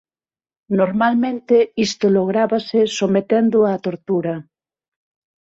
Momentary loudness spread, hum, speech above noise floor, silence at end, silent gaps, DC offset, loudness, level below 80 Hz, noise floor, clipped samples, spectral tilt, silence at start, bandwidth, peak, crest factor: 6 LU; none; over 73 dB; 1 s; none; under 0.1%; -18 LUFS; -60 dBFS; under -90 dBFS; under 0.1%; -6 dB/octave; 0.7 s; 8 kHz; -4 dBFS; 14 dB